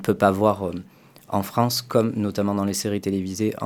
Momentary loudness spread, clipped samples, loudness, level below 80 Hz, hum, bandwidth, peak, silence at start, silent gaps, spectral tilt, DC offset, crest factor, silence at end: 9 LU; under 0.1%; -23 LUFS; -60 dBFS; none; 19 kHz; -2 dBFS; 0 s; none; -5.5 dB/octave; under 0.1%; 20 dB; 0 s